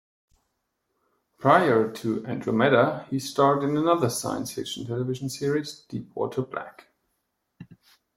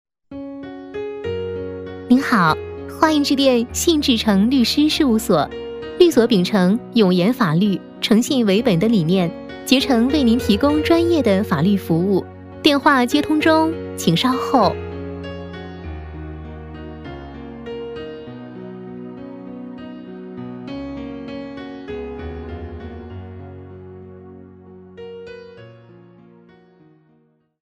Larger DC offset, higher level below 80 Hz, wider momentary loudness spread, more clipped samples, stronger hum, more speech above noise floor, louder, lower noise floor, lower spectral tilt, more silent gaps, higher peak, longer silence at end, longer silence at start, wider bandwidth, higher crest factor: neither; second, -66 dBFS vs -44 dBFS; second, 14 LU vs 19 LU; neither; neither; first, 53 dB vs 44 dB; second, -25 LUFS vs -17 LUFS; first, -77 dBFS vs -59 dBFS; about the same, -5.5 dB/octave vs -5.5 dB/octave; neither; second, -4 dBFS vs 0 dBFS; second, 0.45 s vs 1.9 s; first, 1.4 s vs 0.3 s; about the same, 16.5 kHz vs 15.5 kHz; about the same, 22 dB vs 20 dB